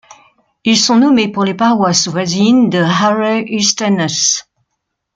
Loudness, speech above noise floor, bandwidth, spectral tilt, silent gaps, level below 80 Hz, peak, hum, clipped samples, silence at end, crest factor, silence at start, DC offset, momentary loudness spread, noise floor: -12 LUFS; 61 dB; 9.4 kHz; -3.5 dB/octave; none; -56 dBFS; 0 dBFS; none; under 0.1%; 0.75 s; 14 dB; 0.65 s; under 0.1%; 5 LU; -73 dBFS